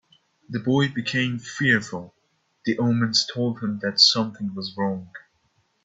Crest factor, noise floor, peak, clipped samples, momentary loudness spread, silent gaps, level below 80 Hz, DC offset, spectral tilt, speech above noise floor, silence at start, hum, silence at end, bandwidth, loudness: 22 dB; -68 dBFS; -2 dBFS; under 0.1%; 16 LU; none; -64 dBFS; under 0.1%; -4 dB/octave; 44 dB; 0.5 s; none; 0.65 s; 8 kHz; -22 LUFS